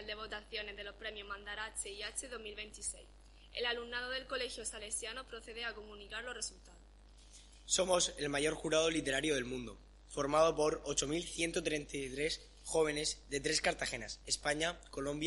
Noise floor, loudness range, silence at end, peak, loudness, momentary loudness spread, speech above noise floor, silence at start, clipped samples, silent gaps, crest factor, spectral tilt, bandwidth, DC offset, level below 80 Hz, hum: -59 dBFS; 8 LU; 0 s; -16 dBFS; -37 LUFS; 13 LU; 21 dB; 0 s; under 0.1%; none; 22 dB; -2.5 dB/octave; 11.5 kHz; under 0.1%; -58 dBFS; none